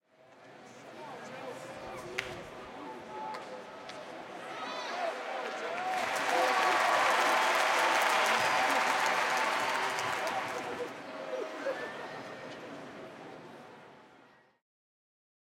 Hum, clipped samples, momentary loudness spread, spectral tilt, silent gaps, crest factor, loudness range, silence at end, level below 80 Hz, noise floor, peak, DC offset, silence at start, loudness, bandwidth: none; under 0.1%; 19 LU; -1.5 dB/octave; none; 22 dB; 16 LU; 1.45 s; -74 dBFS; -61 dBFS; -12 dBFS; under 0.1%; 0.3 s; -31 LUFS; 17 kHz